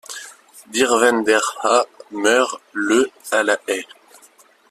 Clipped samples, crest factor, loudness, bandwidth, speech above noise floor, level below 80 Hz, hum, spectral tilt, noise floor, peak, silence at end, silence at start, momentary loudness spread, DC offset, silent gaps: under 0.1%; 18 dB; -18 LUFS; 14.5 kHz; 34 dB; -64 dBFS; none; -1.5 dB/octave; -52 dBFS; -2 dBFS; 0.85 s; 0.1 s; 14 LU; under 0.1%; none